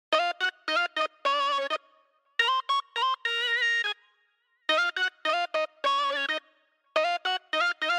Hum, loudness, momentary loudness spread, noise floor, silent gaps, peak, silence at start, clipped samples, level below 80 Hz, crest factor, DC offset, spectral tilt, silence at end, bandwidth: none; -27 LUFS; 7 LU; -71 dBFS; none; -12 dBFS; 0.1 s; under 0.1%; under -90 dBFS; 18 dB; under 0.1%; 1 dB/octave; 0 s; 15.5 kHz